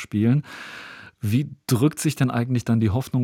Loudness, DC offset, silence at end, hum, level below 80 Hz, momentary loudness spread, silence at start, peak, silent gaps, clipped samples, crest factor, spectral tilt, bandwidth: -23 LUFS; under 0.1%; 0 s; none; -58 dBFS; 16 LU; 0 s; -6 dBFS; none; under 0.1%; 16 dB; -6.5 dB/octave; 17 kHz